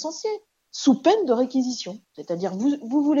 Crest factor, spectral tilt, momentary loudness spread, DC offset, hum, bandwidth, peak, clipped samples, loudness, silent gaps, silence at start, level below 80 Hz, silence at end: 16 dB; -5 dB/octave; 16 LU; under 0.1%; none; 7.6 kHz; -6 dBFS; under 0.1%; -23 LUFS; none; 0 s; -78 dBFS; 0 s